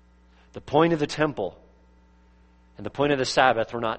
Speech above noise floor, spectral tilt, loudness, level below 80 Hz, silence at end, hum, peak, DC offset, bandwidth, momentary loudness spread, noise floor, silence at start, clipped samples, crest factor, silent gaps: 32 dB; -5 dB/octave; -23 LUFS; -54 dBFS; 0 s; none; -4 dBFS; under 0.1%; 8.4 kHz; 18 LU; -56 dBFS; 0.55 s; under 0.1%; 22 dB; none